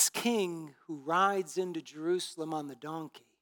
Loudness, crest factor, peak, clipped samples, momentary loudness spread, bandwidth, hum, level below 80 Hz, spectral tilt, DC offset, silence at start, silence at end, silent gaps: -33 LUFS; 22 dB; -12 dBFS; under 0.1%; 14 LU; 19 kHz; none; under -90 dBFS; -3 dB/octave; under 0.1%; 0 s; 0.25 s; none